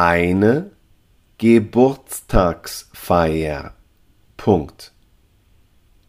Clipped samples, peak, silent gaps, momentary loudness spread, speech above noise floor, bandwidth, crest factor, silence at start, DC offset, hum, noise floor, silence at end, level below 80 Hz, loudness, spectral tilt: under 0.1%; 0 dBFS; none; 16 LU; 39 dB; 16 kHz; 20 dB; 0 s; under 0.1%; none; -56 dBFS; 1.25 s; -34 dBFS; -18 LUFS; -6.5 dB/octave